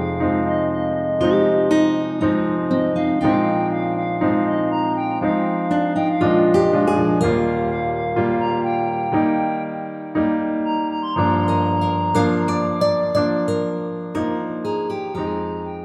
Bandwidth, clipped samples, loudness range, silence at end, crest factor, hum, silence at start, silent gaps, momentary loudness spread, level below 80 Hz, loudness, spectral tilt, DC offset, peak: 11 kHz; under 0.1%; 3 LU; 0 s; 16 dB; none; 0 s; none; 8 LU; -48 dBFS; -20 LUFS; -7.5 dB/octave; under 0.1%; -4 dBFS